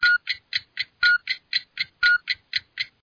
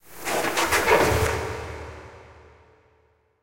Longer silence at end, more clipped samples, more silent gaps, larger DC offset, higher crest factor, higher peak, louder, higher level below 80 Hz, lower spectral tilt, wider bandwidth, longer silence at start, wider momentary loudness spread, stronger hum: second, 0.15 s vs 0.85 s; neither; neither; neither; about the same, 18 dB vs 20 dB; about the same, -6 dBFS vs -6 dBFS; about the same, -23 LUFS vs -22 LUFS; second, -60 dBFS vs -44 dBFS; second, 1.5 dB/octave vs -3.5 dB/octave; second, 5.4 kHz vs 16.5 kHz; about the same, 0 s vs 0.1 s; second, 10 LU vs 20 LU; neither